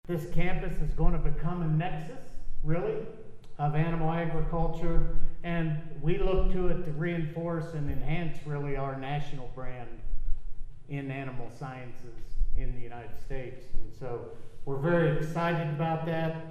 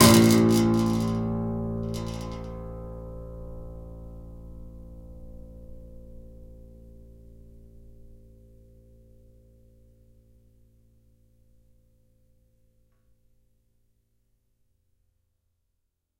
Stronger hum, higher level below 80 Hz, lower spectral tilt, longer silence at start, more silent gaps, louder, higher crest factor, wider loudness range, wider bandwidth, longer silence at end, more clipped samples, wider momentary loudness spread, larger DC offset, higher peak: neither; first, -34 dBFS vs -46 dBFS; first, -8.5 dB/octave vs -5 dB/octave; about the same, 0.05 s vs 0 s; neither; second, -33 LUFS vs -24 LUFS; second, 16 dB vs 26 dB; second, 9 LU vs 27 LU; second, 3.9 kHz vs 16.5 kHz; second, 0 s vs 8.1 s; neither; second, 15 LU vs 28 LU; neither; second, -10 dBFS vs -2 dBFS